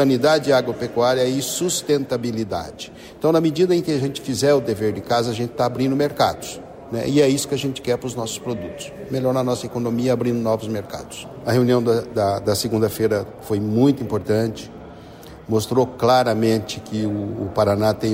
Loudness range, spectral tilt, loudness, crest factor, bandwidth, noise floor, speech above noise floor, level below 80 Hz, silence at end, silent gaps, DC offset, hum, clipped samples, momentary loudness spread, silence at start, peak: 3 LU; -5.5 dB/octave; -20 LUFS; 16 dB; 16 kHz; -40 dBFS; 20 dB; -52 dBFS; 0 s; none; under 0.1%; none; under 0.1%; 13 LU; 0 s; -4 dBFS